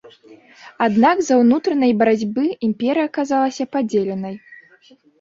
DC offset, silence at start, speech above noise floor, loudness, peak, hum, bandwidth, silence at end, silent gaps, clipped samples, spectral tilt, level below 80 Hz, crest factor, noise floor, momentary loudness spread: under 0.1%; 0.3 s; 34 dB; -18 LUFS; -2 dBFS; none; 7.6 kHz; 0.65 s; none; under 0.1%; -5.5 dB/octave; -62 dBFS; 16 dB; -52 dBFS; 8 LU